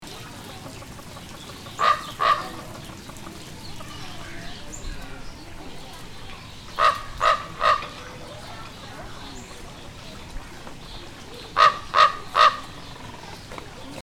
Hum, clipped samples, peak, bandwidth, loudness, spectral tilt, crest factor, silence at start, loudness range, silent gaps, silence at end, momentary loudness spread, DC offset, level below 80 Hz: none; under 0.1%; -2 dBFS; 17 kHz; -21 LUFS; -3 dB/octave; 24 dB; 0 s; 16 LU; none; 0 s; 22 LU; under 0.1%; -44 dBFS